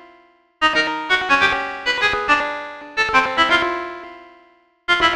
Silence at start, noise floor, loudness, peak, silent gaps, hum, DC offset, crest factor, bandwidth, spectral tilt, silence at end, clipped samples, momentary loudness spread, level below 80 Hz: 0.6 s; -54 dBFS; -17 LUFS; -2 dBFS; none; none; under 0.1%; 18 dB; 13.5 kHz; -2.5 dB/octave; 0 s; under 0.1%; 14 LU; -48 dBFS